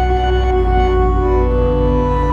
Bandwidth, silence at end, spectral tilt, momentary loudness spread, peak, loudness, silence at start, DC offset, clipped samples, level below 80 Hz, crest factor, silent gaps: 7 kHz; 0 s; -8.5 dB/octave; 1 LU; -2 dBFS; -15 LUFS; 0 s; under 0.1%; under 0.1%; -16 dBFS; 12 dB; none